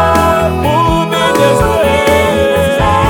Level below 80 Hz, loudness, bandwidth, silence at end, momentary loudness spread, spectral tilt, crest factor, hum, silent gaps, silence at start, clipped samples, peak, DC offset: -24 dBFS; -10 LUFS; 19 kHz; 0 s; 2 LU; -5 dB/octave; 10 dB; none; none; 0 s; under 0.1%; 0 dBFS; under 0.1%